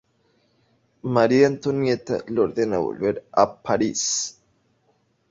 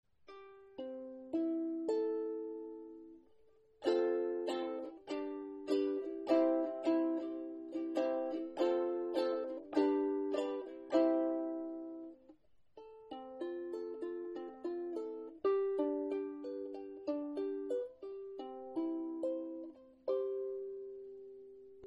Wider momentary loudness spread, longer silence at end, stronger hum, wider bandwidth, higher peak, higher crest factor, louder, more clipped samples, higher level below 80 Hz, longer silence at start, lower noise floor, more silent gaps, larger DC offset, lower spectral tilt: second, 8 LU vs 17 LU; first, 1 s vs 0 s; neither; about the same, 8 kHz vs 8.6 kHz; first, -2 dBFS vs -18 dBFS; about the same, 20 dB vs 20 dB; first, -22 LUFS vs -38 LUFS; neither; first, -58 dBFS vs -80 dBFS; first, 1.05 s vs 0.3 s; about the same, -66 dBFS vs -68 dBFS; neither; neither; about the same, -4.5 dB/octave vs -5.5 dB/octave